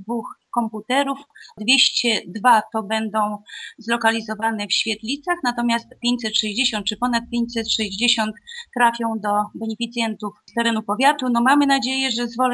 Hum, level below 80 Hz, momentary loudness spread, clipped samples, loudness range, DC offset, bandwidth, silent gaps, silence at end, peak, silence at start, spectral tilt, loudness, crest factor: none; -58 dBFS; 10 LU; under 0.1%; 2 LU; under 0.1%; 11 kHz; none; 0 s; -4 dBFS; 0 s; -2.5 dB/octave; -20 LUFS; 18 dB